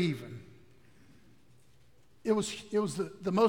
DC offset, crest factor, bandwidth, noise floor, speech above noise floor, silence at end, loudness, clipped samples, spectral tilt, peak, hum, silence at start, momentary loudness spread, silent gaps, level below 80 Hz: 0.1%; 20 dB; 17 kHz; -65 dBFS; 35 dB; 0 s; -33 LUFS; under 0.1%; -5.5 dB/octave; -14 dBFS; none; 0 s; 13 LU; none; -68 dBFS